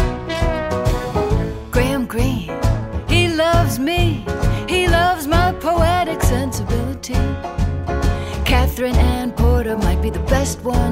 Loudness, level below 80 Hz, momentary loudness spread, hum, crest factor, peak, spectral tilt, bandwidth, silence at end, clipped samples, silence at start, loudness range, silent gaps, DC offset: -18 LUFS; -22 dBFS; 6 LU; none; 14 dB; -4 dBFS; -5.5 dB/octave; 16 kHz; 0 s; under 0.1%; 0 s; 3 LU; none; under 0.1%